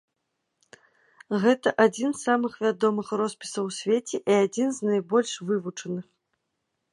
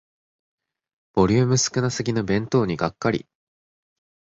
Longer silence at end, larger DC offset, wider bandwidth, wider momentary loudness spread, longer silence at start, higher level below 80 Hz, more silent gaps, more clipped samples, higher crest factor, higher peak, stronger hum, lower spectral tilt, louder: about the same, 0.9 s vs 1 s; neither; first, 11.5 kHz vs 8 kHz; about the same, 9 LU vs 7 LU; first, 1.3 s vs 1.15 s; second, -76 dBFS vs -50 dBFS; neither; neither; about the same, 20 dB vs 18 dB; about the same, -6 dBFS vs -6 dBFS; neither; about the same, -5 dB/octave vs -5 dB/octave; second, -25 LUFS vs -22 LUFS